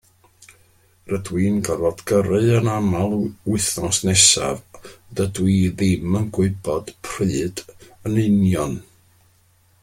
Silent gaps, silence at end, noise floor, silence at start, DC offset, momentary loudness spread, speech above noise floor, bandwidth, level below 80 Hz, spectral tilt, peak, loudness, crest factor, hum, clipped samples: none; 1 s; -58 dBFS; 1.05 s; under 0.1%; 12 LU; 38 dB; 16.5 kHz; -48 dBFS; -4.5 dB/octave; 0 dBFS; -19 LUFS; 20 dB; none; under 0.1%